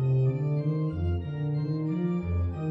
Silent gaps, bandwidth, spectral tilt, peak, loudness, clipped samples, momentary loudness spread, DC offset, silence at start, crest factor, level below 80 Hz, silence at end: none; 4.5 kHz; -11 dB/octave; -18 dBFS; -29 LUFS; under 0.1%; 5 LU; under 0.1%; 0 s; 10 dB; -44 dBFS; 0 s